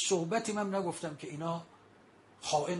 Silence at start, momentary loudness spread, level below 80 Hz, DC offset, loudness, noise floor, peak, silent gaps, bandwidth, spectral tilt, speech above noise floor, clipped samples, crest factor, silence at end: 0 s; 10 LU; -78 dBFS; under 0.1%; -35 LUFS; -61 dBFS; -18 dBFS; none; 11.5 kHz; -4 dB/octave; 27 dB; under 0.1%; 18 dB; 0 s